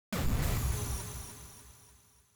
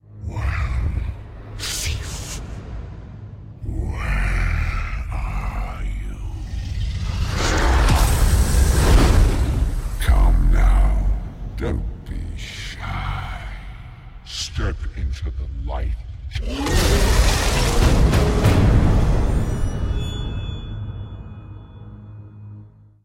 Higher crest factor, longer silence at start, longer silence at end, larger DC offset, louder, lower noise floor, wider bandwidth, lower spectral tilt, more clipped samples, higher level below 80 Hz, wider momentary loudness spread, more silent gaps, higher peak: about the same, 14 dB vs 16 dB; about the same, 0.1 s vs 0.1 s; first, 0.5 s vs 0.35 s; neither; second, -35 LUFS vs -22 LUFS; first, -62 dBFS vs -43 dBFS; first, over 20 kHz vs 16.5 kHz; about the same, -4.5 dB/octave vs -5 dB/octave; neither; second, -40 dBFS vs -22 dBFS; about the same, 21 LU vs 20 LU; neither; second, -20 dBFS vs -4 dBFS